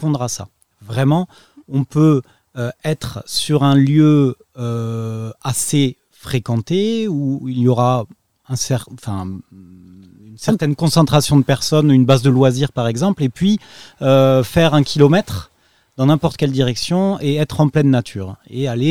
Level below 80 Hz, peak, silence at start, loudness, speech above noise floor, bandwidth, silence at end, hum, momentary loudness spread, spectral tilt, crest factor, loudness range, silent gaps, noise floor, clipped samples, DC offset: -46 dBFS; 0 dBFS; 0 s; -16 LUFS; 26 dB; 16 kHz; 0 s; none; 14 LU; -6 dB/octave; 16 dB; 5 LU; none; -42 dBFS; under 0.1%; 0.5%